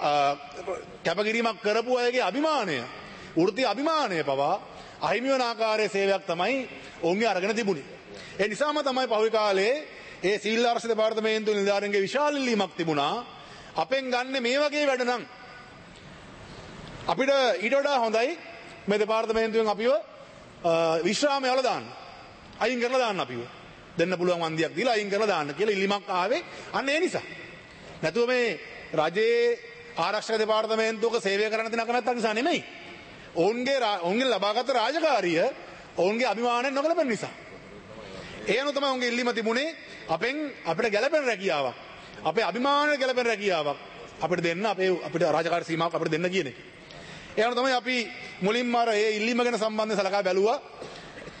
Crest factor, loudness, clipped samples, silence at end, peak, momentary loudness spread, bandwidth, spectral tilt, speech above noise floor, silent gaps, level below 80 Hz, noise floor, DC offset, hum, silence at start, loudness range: 16 dB; -26 LUFS; under 0.1%; 0 s; -10 dBFS; 18 LU; 8.8 kHz; -4 dB/octave; 21 dB; none; -64 dBFS; -47 dBFS; under 0.1%; none; 0 s; 3 LU